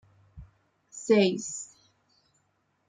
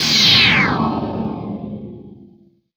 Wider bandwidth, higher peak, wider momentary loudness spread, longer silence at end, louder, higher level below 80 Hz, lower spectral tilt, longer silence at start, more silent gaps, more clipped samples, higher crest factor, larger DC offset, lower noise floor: second, 9.6 kHz vs over 20 kHz; second, -10 dBFS vs 0 dBFS; about the same, 22 LU vs 22 LU; first, 1.25 s vs 0.5 s; second, -26 LUFS vs -13 LUFS; second, -62 dBFS vs -44 dBFS; first, -4.5 dB/octave vs -3 dB/octave; first, 0.35 s vs 0 s; neither; neither; about the same, 20 dB vs 18 dB; neither; first, -73 dBFS vs -50 dBFS